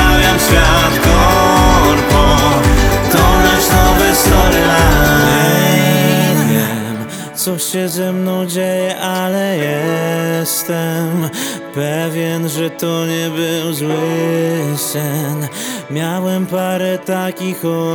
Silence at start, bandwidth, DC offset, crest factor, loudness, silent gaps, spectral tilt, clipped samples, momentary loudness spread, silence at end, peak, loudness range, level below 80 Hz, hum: 0 s; over 20 kHz; under 0.1%; 12 dB; -13 LUFS; none; -4.5 dB/octave; under 0.1%; 9 LU; 0 s; 0 dBFS; 7 LU; -22 dBFS; none